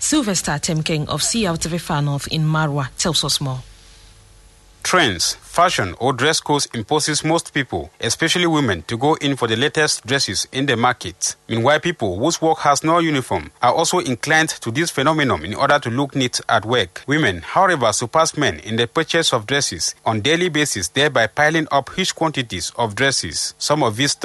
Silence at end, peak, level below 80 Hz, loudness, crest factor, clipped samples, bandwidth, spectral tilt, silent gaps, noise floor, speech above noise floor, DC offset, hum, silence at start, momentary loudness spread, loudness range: 0 s; -2 dBFS; -48 dBFS; -18 LUFS; 16 dB; under 0.1%; 12.5 kHz; -3.5 dB/octave; none; -47 dBFS; 29 dB; under 0.1%; none; 0 s; 5 LU; 2 LU